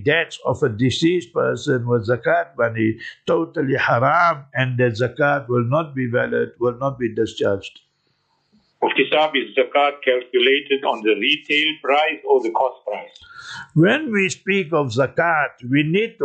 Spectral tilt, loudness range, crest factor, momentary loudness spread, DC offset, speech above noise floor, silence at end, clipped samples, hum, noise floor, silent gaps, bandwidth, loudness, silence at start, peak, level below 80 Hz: -5.5 dB/octave; 4 LU; 16 dB; 6 LU; under 0.1%; 47 dB; 0 s; under 0.1%; none; -67 dBFS; none; 9 kHz; -19 LUFS; 0 s; -4 dBFS; -62 dBFS